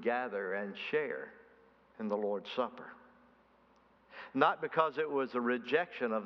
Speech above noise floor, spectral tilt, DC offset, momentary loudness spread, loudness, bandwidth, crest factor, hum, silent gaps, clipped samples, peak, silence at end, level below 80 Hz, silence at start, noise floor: 32 dB; -2.5 dB/octave; under 0.1%; 17 LU; -35 LUFS; 6.2 kHz; 24 dB; none; none; under 0.1%; -12 dBFS; 0 s; -82 dBFS; 0 s; -67 dBFS